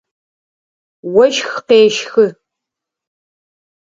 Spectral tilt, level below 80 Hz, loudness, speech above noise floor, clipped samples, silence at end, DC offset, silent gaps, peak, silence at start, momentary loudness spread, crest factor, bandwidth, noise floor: -3.5 dB/octave; -62 dBFS; -13 LUFS; 70 dB; under 0.1%; 1.7 s; under 0.1%; none; 0 dBFS; 1.05 s; 8 LU; 16 dB; 7.6 kHz; -82 dBFS